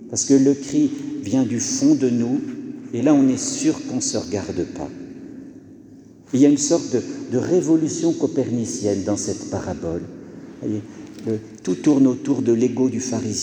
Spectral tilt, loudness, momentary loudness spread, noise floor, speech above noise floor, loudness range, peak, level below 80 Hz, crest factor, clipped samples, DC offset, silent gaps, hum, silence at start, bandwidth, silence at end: -5 dB/octave; -20 LUFS; 16 LU; -44 dBFS; 25 dB; 5 LU; -4 dBFS; -56 dBFS; 18 dB; under 0.1%; under 0.1%; none; none; 0 s; 10.5 kHz; 0 s